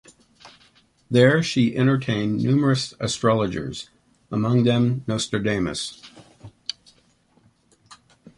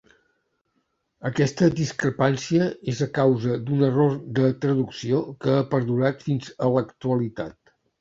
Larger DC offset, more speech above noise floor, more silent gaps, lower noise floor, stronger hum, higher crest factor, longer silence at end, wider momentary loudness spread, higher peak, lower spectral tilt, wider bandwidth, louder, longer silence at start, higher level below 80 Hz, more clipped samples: neither; second, 40 dB vs 50 dB; neither; second, -60 dBFS vs -73 dBFS; neither; about the same, 20 dB vs 18 dB; about the same, 0.45 s vs 0.5 s; first, 16 LU vs 7 LU; first, -2 dBFS vs -6 dBFS; about the same, -6 dB/octave vs -7 dB/octave; first, 11.5 kHz vs 7.8 kHz; about the same, -22 LUFS vs -23 LUFS; second, 0.45 s vs 1.2 s; about the same, -54 dBFS vs -58 dBFS; neither